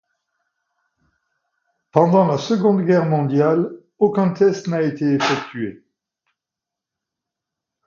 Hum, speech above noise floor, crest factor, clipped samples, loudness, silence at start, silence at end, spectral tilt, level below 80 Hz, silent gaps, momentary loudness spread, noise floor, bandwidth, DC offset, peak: none; 69 dB; 20 dB; under 0.1%; -18 LUFS; 1.95 s; 2.15 s; -7 dB/octave; -66 dBFS; none; 8 LU; -86 dBFS; 7.4 kHz; under 0.1%; 0 dBFS